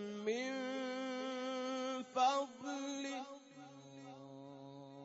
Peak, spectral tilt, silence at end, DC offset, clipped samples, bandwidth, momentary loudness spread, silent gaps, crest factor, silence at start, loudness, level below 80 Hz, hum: -22 dBFS; -2 dB/octave; 0 s; under 0.1%; under 0.1%; 7.6 kHz; 20 LU; none; 20 dB; 0 s; -40 LUFS; under -90 dBFS; none